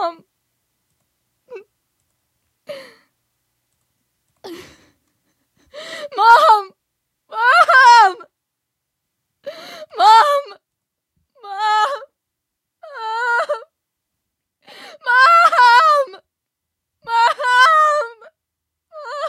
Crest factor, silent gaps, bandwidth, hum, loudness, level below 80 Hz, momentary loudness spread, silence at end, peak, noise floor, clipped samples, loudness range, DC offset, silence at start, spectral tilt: 18 dB; none; 14 kHz; none; -12 LUFS; -72 dBFS; 26 LU; 0 s; 0 dBFS; -80 dBFS; under 0.1%; 10 LU; under 0.1%; 0 s; 0.5 dB/octave